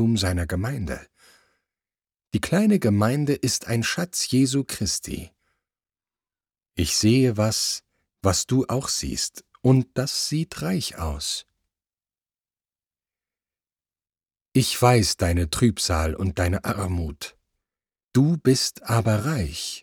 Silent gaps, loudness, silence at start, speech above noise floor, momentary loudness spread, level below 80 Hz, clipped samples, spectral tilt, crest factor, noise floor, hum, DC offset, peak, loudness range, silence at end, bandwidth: 14.41-14.45 s; -23 LUFS; 0 s; over 68 dB; 10 LU; -42 dBFS; under 0.1%; -4.5 dB/octave; 20 dB; under -90 dBFS; none; under 0.1%; -4 dBFS; 6 LU; 0 s; over 20 kHz